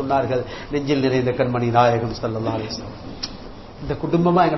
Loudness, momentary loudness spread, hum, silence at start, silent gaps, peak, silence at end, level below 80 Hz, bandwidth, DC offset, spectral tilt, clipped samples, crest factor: -21 LUFS; 14 LU; none; 0 s; none; -2 dBFS; 0 s; -44 dBFS; 6.2 kHz; 0.3%; -7 dB/octave; under 0.1%; 18 dB